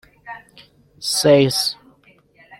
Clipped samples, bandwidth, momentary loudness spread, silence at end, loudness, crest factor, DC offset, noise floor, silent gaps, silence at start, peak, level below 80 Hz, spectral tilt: under 0.1%; 16.5 kHz; 24 LU; 0.85 s; -17 LUFS; 18 dB; under 0.1%; -54 dBFS; none; 0.25 s; -2 dBFS; -58 dBFS; -4 dB/octave